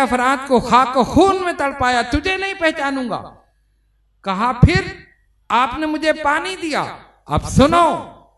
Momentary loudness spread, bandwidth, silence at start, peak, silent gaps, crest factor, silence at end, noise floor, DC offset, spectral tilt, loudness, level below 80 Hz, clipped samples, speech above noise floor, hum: 10 LU; 12.5 kHz; 0 s; 0 dBFS; none; 18 dB; 0.25 s; -60 dBFS; under 0.1%; -5.5 dB/octave; -17 LUFS; -32 dBFS; under 0.1%; 44 dB; none